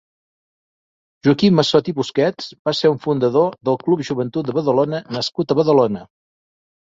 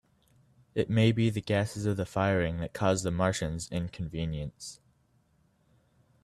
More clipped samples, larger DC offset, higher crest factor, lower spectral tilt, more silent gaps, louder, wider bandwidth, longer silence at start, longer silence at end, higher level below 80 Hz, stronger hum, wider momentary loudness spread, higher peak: neither; neither; about the same, 16 dB vs 20 dB; about the same, -6.5 dB/octave vs -6 dB/octave; first, 2.59-2.65 s vs none; first, -18 LUFS vs -30 LUFS; second, 7.8 kHz vs 13 kHz; first, 1.25 s vs 0.75 s; second, 0.85 s vs 1.5 s; second, -60 dBFS vs -52 dBFS; neither; second, 8 LU vs 11 LU; first, -2 dBFS vs -12 dBFS